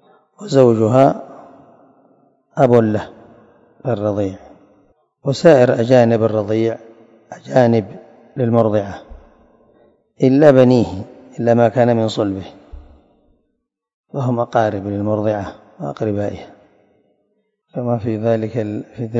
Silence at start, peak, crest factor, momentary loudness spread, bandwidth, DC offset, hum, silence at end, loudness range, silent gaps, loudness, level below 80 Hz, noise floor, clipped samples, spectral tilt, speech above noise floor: 0.4 s; 0 dBFS; 18 dB; 20 LU; 7.8 kHz; under 0.1%; none; 0 s; 7 LU; 13.94-14.04 s; -16 LUFS; -52 dBFS; -71 dBFS; 0.1%; -8 dB/octave; 57 dB